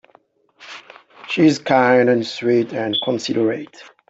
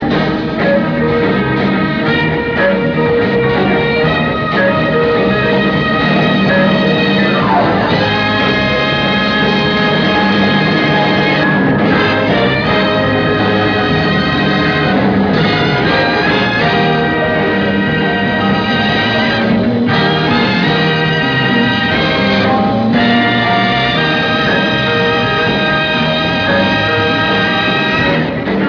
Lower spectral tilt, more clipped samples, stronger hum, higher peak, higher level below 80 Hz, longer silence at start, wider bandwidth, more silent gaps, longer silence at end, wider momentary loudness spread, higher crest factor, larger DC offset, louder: second, -5.5 dB/octave vs -7 dB/octave; neither; neither; about the same, -2 dBFS vs 0 dBFS; second, -64 dBFS vs -36 dBFS; first, 0.6 s vs 0 s; first, 8 kHz vs 5.4 kHz; neither; first, 0.25 s vs 0 s; first, 23 LU vs 2 LU; about the same, 16 dB vs 12 dB; neither; second, -17 LUFS vs -12 LUFS